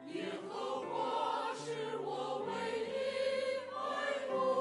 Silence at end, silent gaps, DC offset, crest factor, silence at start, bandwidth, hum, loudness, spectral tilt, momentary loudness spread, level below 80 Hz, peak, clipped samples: 0 s; none; under 0.1%; 16 dB; 0 s; 11.5 kHz; none; -38 LUFS; -4 dB/octave; 5 LU; -82 dBFS; -22 dBFS; under 0.1%